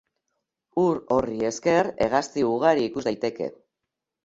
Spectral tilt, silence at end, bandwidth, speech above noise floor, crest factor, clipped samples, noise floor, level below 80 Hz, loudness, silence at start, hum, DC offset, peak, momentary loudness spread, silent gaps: -5.5 dB/octave; 0.7 s; 8 kHz; 61 dB; 20 dB; under 0.1%; -85 dBFS; -58 dBFS; -24 LUFS; 0.75 s; none; under 0.1%; -6 dBFS; 8 LU; none